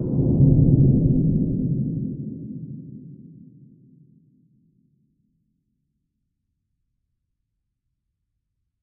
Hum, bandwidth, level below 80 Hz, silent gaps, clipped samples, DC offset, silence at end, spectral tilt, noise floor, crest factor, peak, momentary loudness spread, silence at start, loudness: none; 1.1 kHz; -38 dBFS; none; under 0.1%; under 0.1%; 5.55 s; -15 dB/octave; -77 dBFS; 20 dB; -4 dBFS; 21 LU; 0 s; -20 LUFS